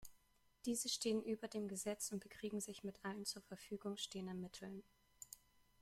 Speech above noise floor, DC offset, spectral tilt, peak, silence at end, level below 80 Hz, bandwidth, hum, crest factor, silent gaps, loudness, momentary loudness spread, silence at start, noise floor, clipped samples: 29 dB; under 0.1%; -3.5 dB/octave; -28 dBFS; 0.45 s; -78 dBFS; 16 kHz; none; 18 dB; none; -46 LUFS; 16 LU; 0 s; -75 dBFS; under 0.1%